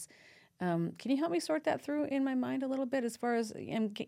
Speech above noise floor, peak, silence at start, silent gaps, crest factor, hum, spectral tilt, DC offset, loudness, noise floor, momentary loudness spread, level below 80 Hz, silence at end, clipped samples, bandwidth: 27 dB; -22 dBFS; 0 s; none; 14 dB; none; -6 dB/octave; under 0.1%; -34 LUFS; -61 dBFS; 3 LU; -80 dBFS; 0 s; under 0.1%; 15.5 kHz